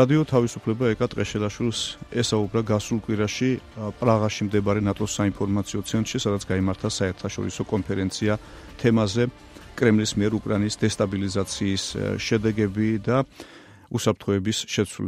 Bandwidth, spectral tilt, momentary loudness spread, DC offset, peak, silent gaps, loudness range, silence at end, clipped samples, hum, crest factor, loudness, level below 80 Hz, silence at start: 15 kHz; -5.5 dB/octave; 6 LU; under 0.1%; -4 dBFS; none; 2 LU; 0 s; under 0.1%; none; 20 dB; -24 LUFS; -48 dBFS; 0 s